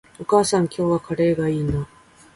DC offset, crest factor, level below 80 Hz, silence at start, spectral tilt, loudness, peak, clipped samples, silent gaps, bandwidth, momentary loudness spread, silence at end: under 0.1%; 18 dB; -44 dBFS; 0.2 s; -6 dB/octave; -21 LUFS; -4 dBFS; under 0.1%; none; 11.5 kHz; 8 LU; 0.5 s